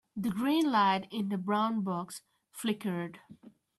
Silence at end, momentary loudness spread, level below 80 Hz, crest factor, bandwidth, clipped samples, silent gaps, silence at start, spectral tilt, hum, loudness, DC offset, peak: 0.3 s; 16 LU; -74 dBFS; 18 dB; 13 kHz; under 0.1%; none; 0.15 s; -5.5 dB/octave; none; -31 LUFS; under 0.1%; -16 dBFS